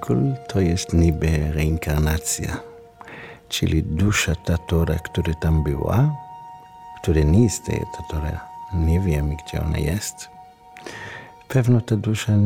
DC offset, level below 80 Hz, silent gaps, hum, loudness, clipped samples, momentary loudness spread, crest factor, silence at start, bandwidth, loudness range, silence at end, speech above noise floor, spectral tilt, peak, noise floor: under 0.1%; -30 dBFS; none; none; -22 LUFS; under 0.1%; 20 LU; 16 dB; 0 s; 17 kHz; 3 LU; 0 s; 24 dB; -6 dB/octave; -4 dBFS; -44 dBFS